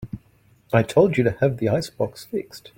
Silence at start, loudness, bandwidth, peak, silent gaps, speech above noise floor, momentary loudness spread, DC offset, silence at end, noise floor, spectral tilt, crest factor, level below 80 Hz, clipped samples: 0 s; -22 LUFS; 16.5 kHz; -4 dBFS; none; 36 dB; 13 LU; under 0.1%; 0.2 s; -57 dBFS; -7 dB/octave; 20 dB; -52 dBFS; under 0.1%